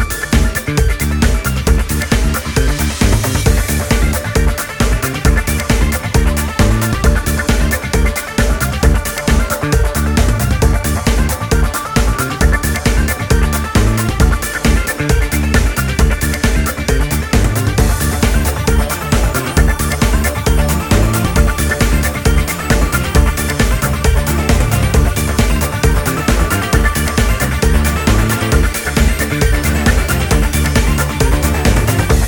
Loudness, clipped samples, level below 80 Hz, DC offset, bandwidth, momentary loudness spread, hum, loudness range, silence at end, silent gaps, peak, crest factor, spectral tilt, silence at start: -14 LUFS; under 0.1%; -16 dBFS; under 0.1%; 17.5 kHz; 2 LU; none; 1 LU; 0 s; none; 0 dBFS; 12 dB; -5 dB/octave; 0 s